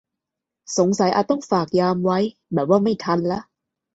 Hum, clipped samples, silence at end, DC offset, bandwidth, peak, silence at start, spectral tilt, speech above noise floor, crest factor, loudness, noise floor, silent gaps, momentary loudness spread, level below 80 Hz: none; under 0.1%; 0.5 s; under 0.1%; 8 kHz; -4 dBFS; 0.7 s; -6 dB/octave; 65 dB; 18 dB; -21 LUFS; -84 dBFS; none; 7 LU; -60 dBFS